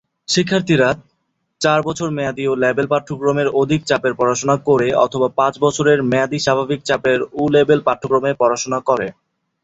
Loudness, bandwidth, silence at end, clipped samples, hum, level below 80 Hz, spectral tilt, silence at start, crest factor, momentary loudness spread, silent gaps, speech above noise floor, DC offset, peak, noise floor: -17 LUFS; 8.2 kHz; 0.5 s; under 0.1%; none; -52 dBFS; -5 dB/octave; 0.3 s; 16 dB; 5 LU; none; 53 dB; under 0.1%; 0 dBFS; -69 dBFS